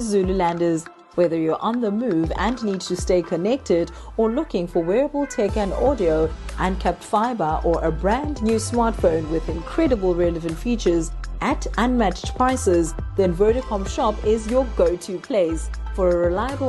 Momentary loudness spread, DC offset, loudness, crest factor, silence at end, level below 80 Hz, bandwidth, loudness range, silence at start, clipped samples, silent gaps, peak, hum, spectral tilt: 6 LU; under 0.1%; -22 LUFS; 16 dB; 0 s; -32 dBFS; 12.5 kHz; 1 LU; 0 s; under 0.1%; none; -6 dBFS; none; -6 dB/octave